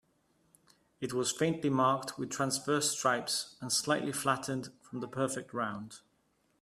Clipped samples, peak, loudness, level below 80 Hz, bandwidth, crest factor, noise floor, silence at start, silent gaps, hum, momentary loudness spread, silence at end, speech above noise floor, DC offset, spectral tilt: under 0.1%; -16 dBFS; -33 LUFS; -74 dBFS; 15.5 kHz; 20 dB; -74 dBFS; 1 s; none; none; 11 LU; 0.65 s; 41 dB; under 0.1%; -3.5 dB/octave